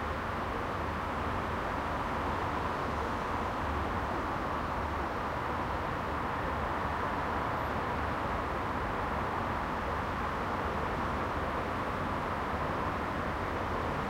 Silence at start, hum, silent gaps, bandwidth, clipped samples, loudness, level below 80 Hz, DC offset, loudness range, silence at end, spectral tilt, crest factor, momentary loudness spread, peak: 0 s; none; none; 16.5 kHz; under 0.1%; -34 LUFS; -44 dBFS; under 0.1%; 1 LU; 0 s; -6.5 dB/octave; 14 dB; 1 LU; -20 dBFS